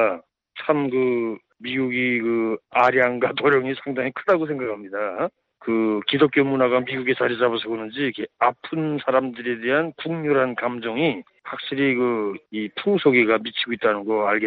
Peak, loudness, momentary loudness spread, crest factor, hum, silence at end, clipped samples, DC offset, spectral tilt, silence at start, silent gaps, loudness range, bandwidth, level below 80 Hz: -4 dBFS; -22 LUFS; 10 LU; 18 dB; none; 0 s; under 0.1%; under 0.1%; -8 dB/octave; 0 s; none; 2 LU; 5.6 kHz; -66 dBFS